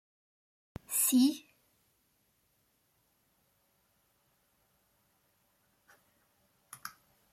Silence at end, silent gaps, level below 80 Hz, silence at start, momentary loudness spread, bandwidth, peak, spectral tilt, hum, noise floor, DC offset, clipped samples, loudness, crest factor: 0.45 s; none; -72 dBFS; 0.9 s; 25 LU; 16 kHz; -16 dBFS; -2 dB/octave; none; -75 dBFS; under 0.1%; under 0.1%; -28 LUFS; 22 dB